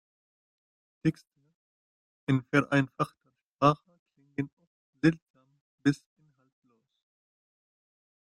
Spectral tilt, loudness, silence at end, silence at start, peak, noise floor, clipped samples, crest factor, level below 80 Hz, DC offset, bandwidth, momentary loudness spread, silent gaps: -7 dB/octave; -30 LUFS; 2.4 s; 1.05 s; -8 dBFS; under -90 dBFS; under 0.1%; 24 dB; -68 dBFS; under 0.1%; 11 kHz; 14 LU; 1.55-2.27 s, 3.42-3.54 s, 3.99-4.06 s, 4.53-4.57 s, 4.67-4.93 s, 5.22-5.34 s, 5.61-5.78 s